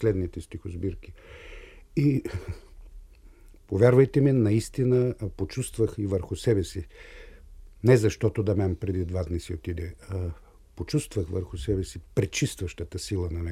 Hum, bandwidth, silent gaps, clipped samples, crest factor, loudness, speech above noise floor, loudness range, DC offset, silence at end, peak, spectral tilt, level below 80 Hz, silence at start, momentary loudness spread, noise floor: none; 14.5 kHz; none; under 0.1%; 22 dB; -27 LUFS; 25 dB; 7 LU; under 0.1%; 0 s; -6 dBFS; -7 dB/octave; -44 dBFS; 0 s; 20 LU; -51 dBFS